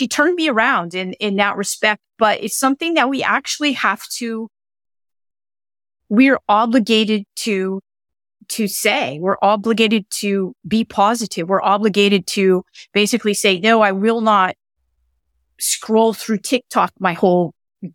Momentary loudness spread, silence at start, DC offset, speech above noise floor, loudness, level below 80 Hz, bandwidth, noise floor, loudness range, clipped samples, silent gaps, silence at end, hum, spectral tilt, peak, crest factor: 8 LU; 0 s; under 0.1%; 51 dB; -17 LUFS; -62 dBFS; 18 kHz; -68 dBFS; 4 LU; under 0.1%; none; 0.05 s; none; -3.5 dB/octave; -2 dBFS; 16 dB